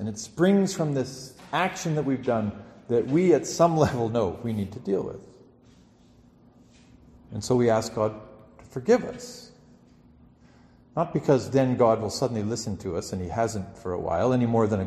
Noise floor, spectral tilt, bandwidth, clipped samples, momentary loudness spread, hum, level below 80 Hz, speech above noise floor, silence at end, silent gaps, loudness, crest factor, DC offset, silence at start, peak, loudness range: -56 dBFS; -6 dB/octave; 13 kHz; under 0.1%; 14 LU; none; -56 dBFS; 31 dB; 0 s; none; -25 LUFS; 20 dB; under 0.1%; 0 s; -6 dBFS; 6 LU